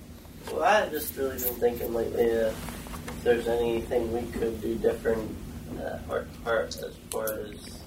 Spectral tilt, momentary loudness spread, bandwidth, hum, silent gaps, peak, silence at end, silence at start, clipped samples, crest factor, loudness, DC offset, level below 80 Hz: -4.5 dB/octave; 13 LU; 16 kHz; none; none; -10 dBFS; 0 s; 0 s; under 0.1%; 18 dB; -29 LUFS; under 0.1%; -46 dBFS